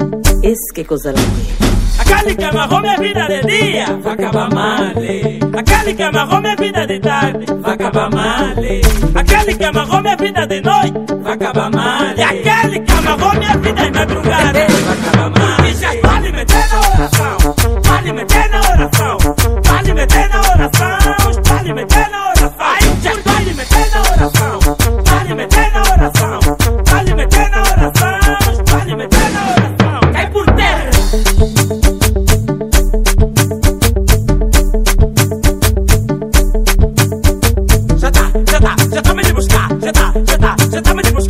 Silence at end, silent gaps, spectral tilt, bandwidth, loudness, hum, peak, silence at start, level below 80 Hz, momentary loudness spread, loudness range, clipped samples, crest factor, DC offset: 0 s; none; -4.5 dB/octave; 16.5 kHz; -12 LUFS; none; 0 dBFS; 0 s; -14 dBFS; 4 LU; 2 LU; 0.4%; 10 dB; 0.9%